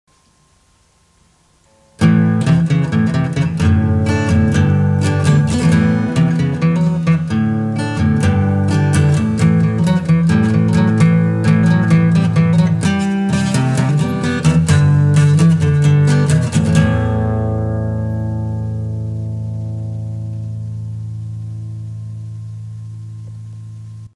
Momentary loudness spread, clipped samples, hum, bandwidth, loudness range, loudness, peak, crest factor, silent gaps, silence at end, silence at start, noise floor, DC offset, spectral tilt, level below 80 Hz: 15 LU; under 0.1%; none; 11.5 kHz; 12 LU; -14 LUFS; 0 dBFS; 14 dB; none; 0.1 s; 2 s; -54 dBFS; under 0.1%; -7.5 dB/octave; -40 dBFS